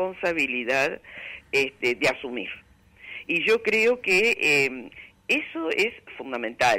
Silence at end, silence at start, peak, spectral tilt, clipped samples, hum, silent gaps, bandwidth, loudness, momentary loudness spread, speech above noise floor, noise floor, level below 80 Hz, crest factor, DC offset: 0 s; 0 s; -12 dBFS; -3 dB/octave; under 0.1%; none; none; 16 kHz; -23 LUFS; 18 LU; 20 dB; -45 dBFS; -62 dBFS; 12 dB; under 0.1%